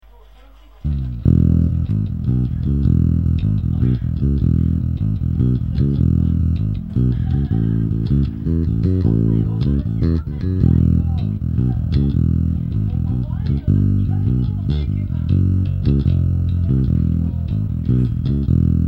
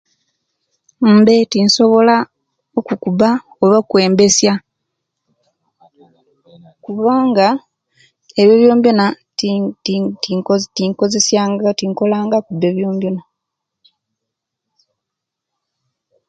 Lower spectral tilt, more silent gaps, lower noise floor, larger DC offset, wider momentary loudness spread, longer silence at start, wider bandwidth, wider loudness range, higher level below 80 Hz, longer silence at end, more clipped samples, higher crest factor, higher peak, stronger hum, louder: first, -11.5 dB/octave vs -4.5 dB/octave; neither; second, -44 dBFS vs -80 dBFS; first, 0.3% vs under 0.1%; second, 5 LU vs 11 LU; second, 0.85 s vs 1 s; second, 4.8 kHz vs 9.2 kHz; second, 1 LU vs 7 LU; first, -24 dBFS vs -60 dBFS; second, 0 s vs 3.1 s; neither; about the same, 16 dB vs 16 dB; about the same, 0 dBFS vs 0 dBFS; neither; second, -18 LUFS vs -14 LUFS